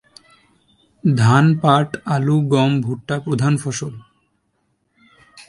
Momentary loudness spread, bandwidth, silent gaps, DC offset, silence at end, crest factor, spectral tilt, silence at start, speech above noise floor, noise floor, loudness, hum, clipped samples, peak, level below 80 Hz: 11 LU; 11.5 kHz; none; under 0.1%; 0.05 s; 18 dB; -6.5 dB/octave; 1.05 s; 51 dB; -67 dBFS; -17 LUFS; none; under 0.1%; 0 dBFS; -54 dBFS